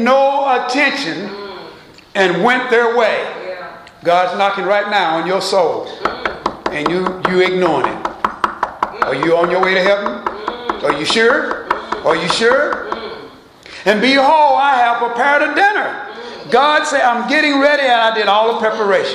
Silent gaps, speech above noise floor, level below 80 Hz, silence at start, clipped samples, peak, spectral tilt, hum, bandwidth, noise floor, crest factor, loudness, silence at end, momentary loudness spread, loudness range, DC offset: none; 24 dB; -52 dBFS; 0 s; under 0.1%; 0 dBFS; -4 dB/octave; none; 12.5 kHz; -38 dBFS; 14 dB; -14 LUFS; 0 s; 12 LU; 3 LU; under 0.1%